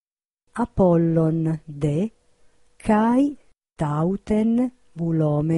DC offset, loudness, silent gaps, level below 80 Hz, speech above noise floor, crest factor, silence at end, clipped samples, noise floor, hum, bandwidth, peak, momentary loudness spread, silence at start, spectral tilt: under 0.1%; -22 LUFS; none; -46 dBFS; 53 dB; 14 dB; 0 s; under 0.1%; -73 dBFS; none; 11 kHz; -8 dBFS; 11 LU; 0.55 s; -9 dB/octave